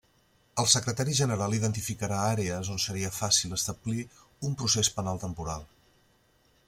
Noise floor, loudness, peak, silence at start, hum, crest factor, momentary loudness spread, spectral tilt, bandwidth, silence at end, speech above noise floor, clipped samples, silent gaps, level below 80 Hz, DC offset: -66 dBFS; -28 LUFS; -6 dBFS; 0.55 s; none; 24 dB; 12 LU; -3.5 dB/octave; 16.5 kHz; 1 s; 37 dB; under 0.1%; none; -56 dBFS; under 0.1%